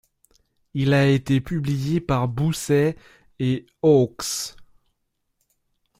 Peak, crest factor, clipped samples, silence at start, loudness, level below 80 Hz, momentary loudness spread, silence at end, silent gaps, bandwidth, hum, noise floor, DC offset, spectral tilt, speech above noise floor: -6 dBFS; 16 dB; under 0.1%; 0.75 s; -22 LUFS; -50 dBFS; 10 LU; 1.35 s; none; 16 kHz; none; -74 dBFS; under 0.1%; -6 dB/octave; 53 dB